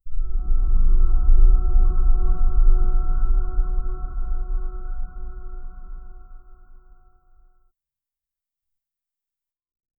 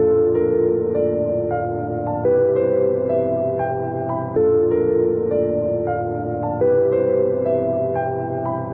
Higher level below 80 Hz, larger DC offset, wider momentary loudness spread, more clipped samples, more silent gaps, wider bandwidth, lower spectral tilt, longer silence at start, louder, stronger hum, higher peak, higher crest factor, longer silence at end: first, -18 dBFS vs -50 dBFS; neither; first, 20 LU vs 7 LU; neither; neither; second, 1.5 kHz vs 3 kHz; about the same, -13.5 dB/octave vs -13.5 dB/octave; about the same, 0.05 s vs 0 s; second, -25 LUFS vs -20 LUFS; neither; first, -4 dBFS vs -8 dBFS; about the same, 14 dB vs 10 dB; first, 3.45 s vs 0 s